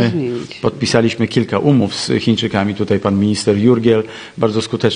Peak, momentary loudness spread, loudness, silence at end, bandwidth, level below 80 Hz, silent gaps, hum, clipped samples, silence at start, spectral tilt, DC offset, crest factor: 0 dBFS; 7 LU; -15 LUFS; 0 s; 10 kHz; -50 dBFS; none; none; under 0.1%; 0 s; -6 dB/octave; under 0.1%; 14 dB